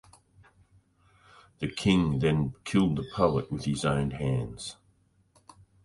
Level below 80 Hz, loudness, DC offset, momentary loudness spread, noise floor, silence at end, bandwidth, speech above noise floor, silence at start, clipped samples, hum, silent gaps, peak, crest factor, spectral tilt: -50 dBFS; -28 LUFS; under 0.1%; 12 LU; -66 dBFS; 1.1 s; 11.5 kHz; 39 dB; 1.6 s; under 0.1%; none; none; -10 dBFS; 20 dB; -6.5 dB/octave